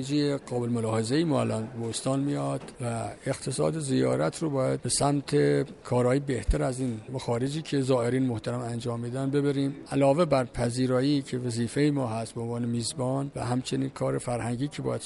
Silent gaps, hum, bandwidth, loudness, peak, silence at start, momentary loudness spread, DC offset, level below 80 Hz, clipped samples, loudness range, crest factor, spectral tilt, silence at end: none; none; 11.5 kHz; -28 LUFS; -10 dBFS; 0 s; 7 LU; under 0.1%; -44 dBFS; under 0.1%; 3 LU; 16 dB; -6 dB/octave; 0 s